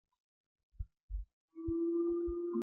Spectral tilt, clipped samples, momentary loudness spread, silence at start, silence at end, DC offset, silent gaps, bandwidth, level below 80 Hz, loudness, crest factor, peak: -13 dB/octave; under 0.1%; 18 LU; 0.8 s; 0 s; under 0.1%; 1.03-1.08 s, 1.33-1.48 s; 1.5 kHz; -50 dBFS; -37 LUFS; 12 dB; -26 dBFS